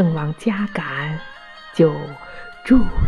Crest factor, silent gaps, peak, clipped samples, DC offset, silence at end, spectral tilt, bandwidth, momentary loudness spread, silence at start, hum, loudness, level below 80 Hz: 16 dB; none; -2 dBFS; under 0.1%; under 0.1%; 0 s; -8 dB/octave; 11 kHz; 19 LU; 0 s; none; -21 LUFS; -30 dBFS